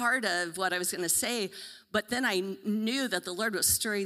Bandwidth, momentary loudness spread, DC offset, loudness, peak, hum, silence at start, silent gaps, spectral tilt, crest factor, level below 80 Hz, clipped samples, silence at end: 16 kHz; 8 LU; under 0.1%; -29 LUFS; -10 dBFS; none; 0 s; none; -2 dB/octave; 20 dB; -62 dBFS; under 0.1%; 0 s